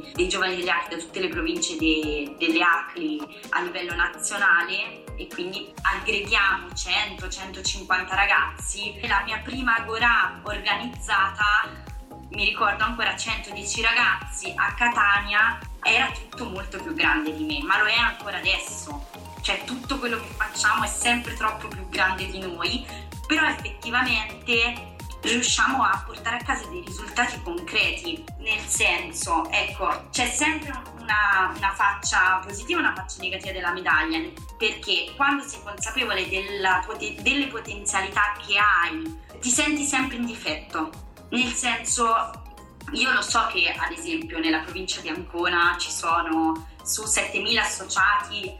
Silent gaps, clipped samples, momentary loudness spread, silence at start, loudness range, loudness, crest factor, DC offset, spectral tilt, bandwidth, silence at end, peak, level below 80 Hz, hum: none; under 0.1%; 11 LU; 0 s; 3 LU; -23 LUFS; 18 dB; under 0.1%; -2 dB/octave; 16.5 kHz; 0 s; -8 dBFS; -42 dBFS; none